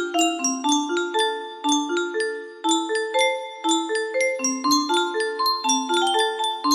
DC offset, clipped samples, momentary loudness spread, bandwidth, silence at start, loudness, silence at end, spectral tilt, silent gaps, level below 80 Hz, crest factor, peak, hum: under 0.1%; under 0.1%; 5 LU; 15.5 kHz; 0 s; -22 LUFS; 0 s; 0 dB/octave; none; -72 dBFS; 16 dB; -6 dBFS; none